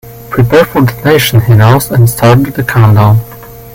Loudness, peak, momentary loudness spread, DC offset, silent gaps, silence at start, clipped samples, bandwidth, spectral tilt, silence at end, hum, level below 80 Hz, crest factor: -8 LUFS; 0 dBFS; 6 LU; under 0.1%; none; 0.05 s; 1%; 17 kHz; -6.5 dB/octave; 0 s; none; -32 dBFS; 8 dB